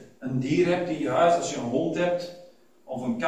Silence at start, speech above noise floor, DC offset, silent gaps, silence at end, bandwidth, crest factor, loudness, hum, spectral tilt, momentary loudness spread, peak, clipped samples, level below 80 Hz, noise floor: 0 s; 27 dB; 0.1%; none; 0 s; 11 kHz; 16 dB; -25 LUFS; none; -5.5 dB/octave; 11 LU; -10 dBFS; under 0.1%; -62 dBFS; -52 dBFS